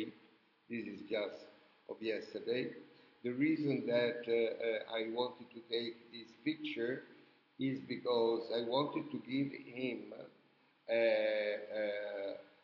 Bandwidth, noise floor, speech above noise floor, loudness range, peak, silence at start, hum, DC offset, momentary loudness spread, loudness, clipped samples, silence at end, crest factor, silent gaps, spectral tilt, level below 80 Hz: 6 kHz; -71 dBFS; 33 dB; 4 LU; -20 dBFS; 0 s; none; under 0.1%; 13 LU; -38 LUFS; under 0.1%; 0.2 s; 18 dB; none; -7.5 dB/octave; -90 dBFS